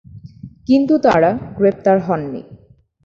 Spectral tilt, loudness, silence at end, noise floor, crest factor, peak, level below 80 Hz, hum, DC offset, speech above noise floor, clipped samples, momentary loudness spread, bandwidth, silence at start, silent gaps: -8 dB/octave; -15 LUFS; 0.5 s; -48 dBFS; 16 dB; -2 dBFS; -48 dBFS; none; under 0.1%; 34 dB; under 0.1%; 19 LU; 7.2 kHz; 0.15 s; none